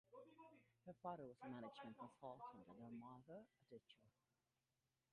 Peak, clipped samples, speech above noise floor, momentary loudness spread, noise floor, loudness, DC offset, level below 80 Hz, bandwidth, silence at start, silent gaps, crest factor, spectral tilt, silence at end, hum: -38 dBFS; under 0.1%; over 31 dB; 12 LU; under -90 dBFS; -60 LUFS; under 0.1%; under -90 dBFS; 4.9 kHz; 0.1 s; none; 22 dB; -5.5 dB/octave; 1 s; none